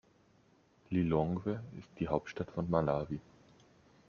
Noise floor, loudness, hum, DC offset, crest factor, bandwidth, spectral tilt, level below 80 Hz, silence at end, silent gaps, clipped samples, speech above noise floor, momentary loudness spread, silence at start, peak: -68 dBFS; -36 LUFS; none; under 0.1%; 22 dB; 7 kHz; -9 dB/octave; -60 dBFS; 0.9 s; none; under 0.1%; 33 dB; 11 LU; 0.9 s; -14 dBFS